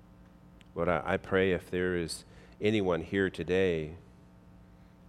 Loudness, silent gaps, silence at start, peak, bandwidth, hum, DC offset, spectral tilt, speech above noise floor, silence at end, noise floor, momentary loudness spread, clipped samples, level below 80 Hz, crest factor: -31 LUFS; none; 0.2 s; -12 dBFS; 14.5 kHz; none; under 0.1%; -6 dB/octave; 25 dB; 0 s; -56 dBFS; 12 LU; under 0.1%; -58 dBFS; 20 dB